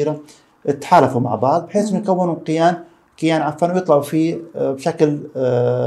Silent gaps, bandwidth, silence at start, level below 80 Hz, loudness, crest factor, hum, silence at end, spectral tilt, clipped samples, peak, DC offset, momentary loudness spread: none; 13 kHz; 0 s; -64 dBFS; -18 LUFS; 18 dB; none; 0 s; -7 dB/octave; under 0.1%; 0 dBFS; under 0.1%; 9 LU